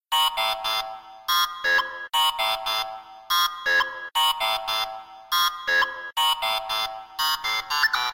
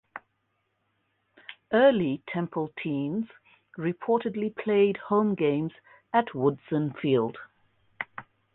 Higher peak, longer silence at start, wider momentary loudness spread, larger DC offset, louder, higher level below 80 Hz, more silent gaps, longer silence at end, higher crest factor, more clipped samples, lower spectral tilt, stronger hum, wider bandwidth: about the same, -10 dBFS vs -10 dBFS; about the same, 0.1 s vs 0.15 s; second, 6 LU vs 23 LU; neither; first, -23 LUFS vs -27 LUFS; first, -60 dBFS vs -70 dBFS; neither; second, 0 s vs 0.35 s; about the same, 16 dB vs 18 dB; neither; second, 2 dB/octave vs -10.5 dB/octave; neither; first, 16.5 kHz vs 4.1 kHz